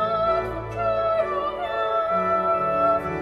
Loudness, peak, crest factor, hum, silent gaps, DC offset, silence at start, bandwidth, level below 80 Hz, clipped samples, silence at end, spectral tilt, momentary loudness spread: -23 LUFS; -10 dBFS; 14 dB; none; none; under 0.1%; 0 s; 11 kHz; -46 dBFS; under 0.1%; 0 s; -7 dB/octave; 5 LU